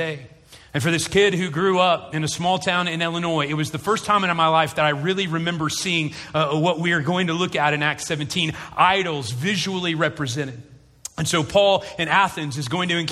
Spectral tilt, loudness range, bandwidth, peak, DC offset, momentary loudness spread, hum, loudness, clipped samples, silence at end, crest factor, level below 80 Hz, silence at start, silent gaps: -4 dB/octave; 2 LU; 14.5 kHz; -2 dBFS; under 0.1%; 8 LU; none; -21 LUFS; under 0.1%; 0 s; 20 dB; -54 dBFS; 0 s; none